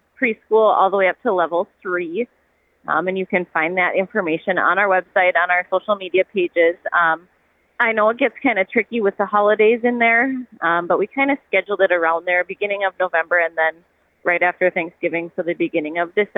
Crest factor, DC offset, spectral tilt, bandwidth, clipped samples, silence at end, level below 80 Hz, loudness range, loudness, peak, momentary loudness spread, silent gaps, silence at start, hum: 16 dB; under 0.1%; -8 dB/octave; 4 kHz; under 0.1%; 0.1 s; -70 dBFS; 3 LU; -18 LUFS; -2 dBFS; 8 LU; none; 0.2 s; none